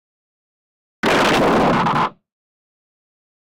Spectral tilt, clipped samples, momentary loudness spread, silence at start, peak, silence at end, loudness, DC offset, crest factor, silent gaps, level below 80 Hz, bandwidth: -5 dB/octave; under 0.1%; 8 LU; 1.05 s; -6 dBFS; 1.3 s; -17 LUFS; under 0.1%; 14 dB; none; -46 dBFS; 18 kHz